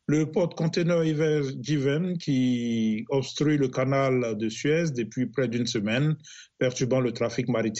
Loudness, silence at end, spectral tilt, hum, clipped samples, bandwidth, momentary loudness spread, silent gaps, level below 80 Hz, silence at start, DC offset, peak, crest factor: -26 LUFS; 0 s; -6 dB/octave; none; under 0.1%; 8.2 kHz; 4 LU; none; -64 dBFS; 0.1 s; under 0.1%; -12 dBFS; 12 dB